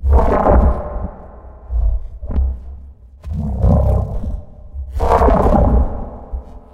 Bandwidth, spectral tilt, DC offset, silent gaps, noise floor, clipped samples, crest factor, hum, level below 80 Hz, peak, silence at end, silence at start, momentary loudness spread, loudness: 4.8 kHz; -9.5 dB/octave; under 0.1%; none; -37 dBFS; under 0.1%; 16 dB; none; -18 dBFS; 0 dBFS; 0.15 s; 0 s; 19 LU; -17 LUFS